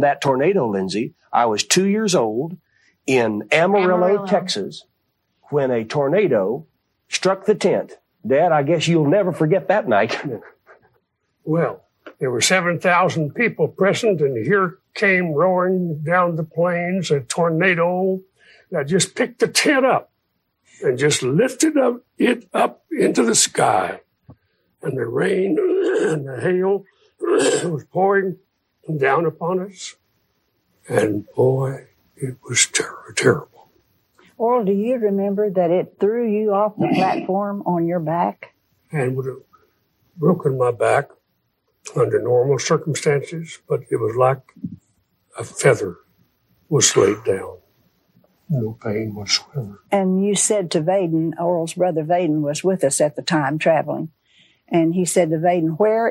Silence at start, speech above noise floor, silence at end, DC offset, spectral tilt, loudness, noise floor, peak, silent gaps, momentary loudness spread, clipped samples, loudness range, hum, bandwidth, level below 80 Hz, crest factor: 0 s; 53 dB; 0 s; under 0.1%; -4.5 dB/octave; -19 LUFS; -71 dBFS; 0 dBFS; none; 11 LU; under 0.1%; 4 LU; none; 16 kHz; -66 dBFS; 18 dB